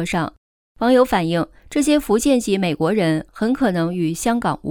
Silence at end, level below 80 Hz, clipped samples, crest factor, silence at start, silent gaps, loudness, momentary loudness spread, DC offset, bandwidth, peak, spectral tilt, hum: 0 s; -44 dBFS; under 0.1%; 16 dB; 0 s; 0.38-0.75 s; -19 LUFS; 7 LU; under 0.1%; 19.5 kHz; -4 dBFS; -5.5 dB/octave; none